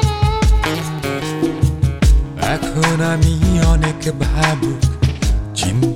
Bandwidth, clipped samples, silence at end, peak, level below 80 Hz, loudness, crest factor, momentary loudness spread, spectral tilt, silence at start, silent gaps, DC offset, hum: 15.5 kHz; under 0.1%; 0 s; -2 dBFS; -20 dBFS; -17 LUFS; 12 dB; 6 LU; -5.5 dB/octave; 0 s; none; under 0.1%; none